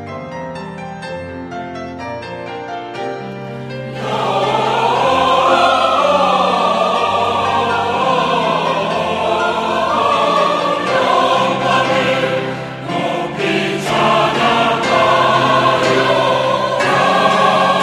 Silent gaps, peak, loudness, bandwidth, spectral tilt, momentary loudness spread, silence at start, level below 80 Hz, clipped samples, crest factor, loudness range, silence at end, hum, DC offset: none; 0 dBFS; -14 LUFS; 14.5 kHz; -4.5 dB/octave; 14 LU; 0 s; -50 dBFS; under 0.1%; 16 dB; 10 LU; 0 s; none; under 0.1%